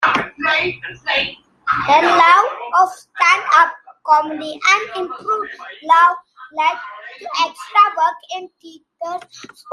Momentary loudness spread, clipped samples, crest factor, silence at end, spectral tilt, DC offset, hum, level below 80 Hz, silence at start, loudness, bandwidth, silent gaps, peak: 18 LU; under 0.1%; 16 dB; 0 s; -2 dB/octave; under 0.1%; none; -58 dBFS; 0 s; -15 LUFS; 12 kHz; none; -2 dBFS